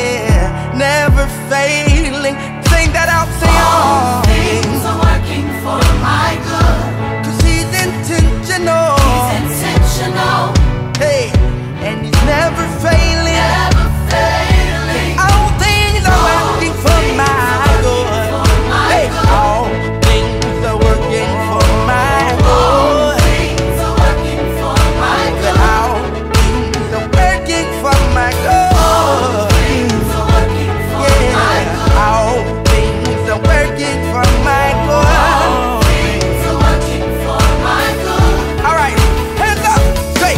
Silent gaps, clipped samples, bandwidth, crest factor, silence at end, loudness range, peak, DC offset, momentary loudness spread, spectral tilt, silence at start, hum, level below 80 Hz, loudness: none; under 0.1%; 16.5 kHz; 12 dB; 0 s; 2 LU; 0 dBFS; under 0.1%; 5 LU; -5 dB/octave; 0 s; none; -16 dBFS; -12 LUFS